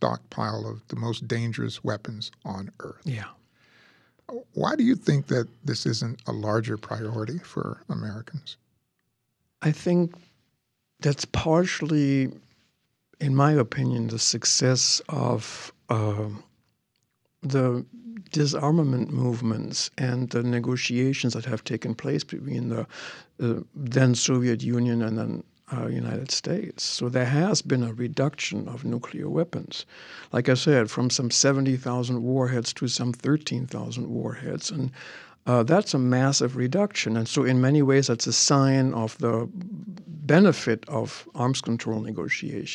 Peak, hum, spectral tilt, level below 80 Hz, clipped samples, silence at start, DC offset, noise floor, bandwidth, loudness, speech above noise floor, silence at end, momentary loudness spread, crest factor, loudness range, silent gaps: -4 dBFS; none; -5 dB/octave; -60 dBFS; under 0.1%; 0 s; under 0.1%; -76 dBFS; 10.5 kHz; -25 LUFS; 51 dB; 0 s; 15 LU; 22 dB; 8 LU; none